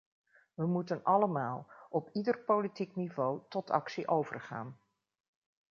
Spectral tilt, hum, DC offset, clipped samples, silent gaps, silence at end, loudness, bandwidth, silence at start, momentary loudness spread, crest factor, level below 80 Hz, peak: -6.5 dB/octave; none; under 0.1%; under 0.1%; none; 0.95 s; -34 LUFS; 7.2 kHz; 0.6 s; 13 LU; 22 dB; -82 dBFS; -14 dBFS